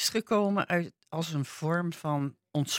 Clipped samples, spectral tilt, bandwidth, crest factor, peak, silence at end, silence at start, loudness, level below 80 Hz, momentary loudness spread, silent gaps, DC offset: under 0.1%; -4.5 dB/octave; 16.5 kHz; 16 dB; -14 dBFS; 0 s; 0 s; -31 LUFS; -74 dBFS; 7 LU; none; under 0.1%